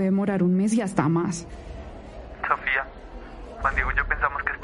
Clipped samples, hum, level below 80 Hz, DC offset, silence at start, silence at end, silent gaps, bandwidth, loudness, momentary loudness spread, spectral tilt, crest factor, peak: under 0.1%; none; -38 dBFS; under 0.1%; 0 s; 0 s; none; 11.5 kHz; -24 LUFS; 19 LU; -6.5 dB/octave; 20 dB; -6 dBFS